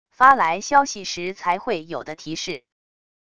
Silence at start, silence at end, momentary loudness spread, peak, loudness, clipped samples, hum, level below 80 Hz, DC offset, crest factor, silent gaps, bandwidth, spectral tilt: 0.2 s; 0.8 s; 17 LU; 0 dBFS; -20 LUFS; under 0.1%; none; -60 dBFS; 0.4%; 22 dB; none; 10.5 kHz; -2.5 dB/octave